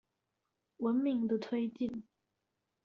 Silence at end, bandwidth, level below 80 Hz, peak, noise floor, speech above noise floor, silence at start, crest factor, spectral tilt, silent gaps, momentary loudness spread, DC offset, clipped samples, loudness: 0.85 s; 6.4 kHz; -76 dBFS; -22 dBFS; -86 dBFS; 52 dB; 0.8 s; 16 dB; -6.5 dB/octave; none; 8 LU; under 0.1%; under 0.1%; -35 LUFS